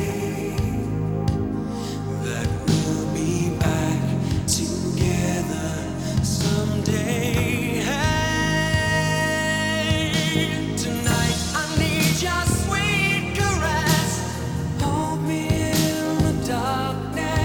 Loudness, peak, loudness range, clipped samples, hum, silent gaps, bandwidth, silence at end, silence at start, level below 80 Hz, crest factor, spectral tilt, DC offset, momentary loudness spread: -22 LUFS; -6 dBFS; 3 LU; under 0.1%; none; none; over 20 kHz; 0 s; 0 s; -36 dBFS; 16 dB; -4.5 dB/octave; 0.1%; 6 LU